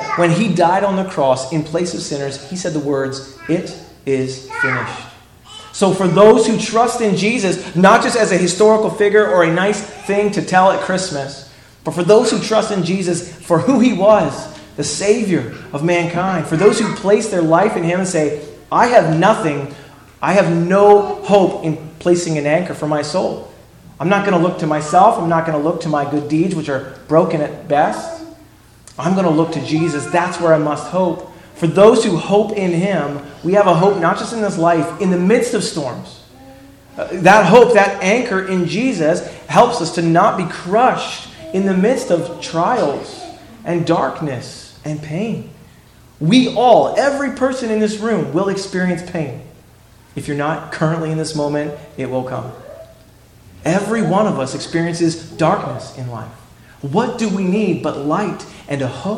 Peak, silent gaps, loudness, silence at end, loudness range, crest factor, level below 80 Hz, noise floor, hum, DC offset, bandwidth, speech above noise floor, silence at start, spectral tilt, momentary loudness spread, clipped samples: 0 dBFS; none; -15 LUFS; 0 s; 7 LU; 16 dB; -50 dBFS; -45 dBFS; none; under 0.1%; 12.5 kHz; 30 dB; 0 s; -5.5 dB/octave; 15 LU; 0.1%